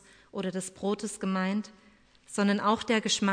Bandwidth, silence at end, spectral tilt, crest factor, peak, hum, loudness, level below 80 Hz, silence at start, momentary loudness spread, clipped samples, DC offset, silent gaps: 10.5 kHz; 0 s; -4 dB/octave; 18 dB; -12 dBFS; none; -30 LUFS; -68 dBFS; 0.35 s; 11 LU; under 0.1%; under 0.1%; none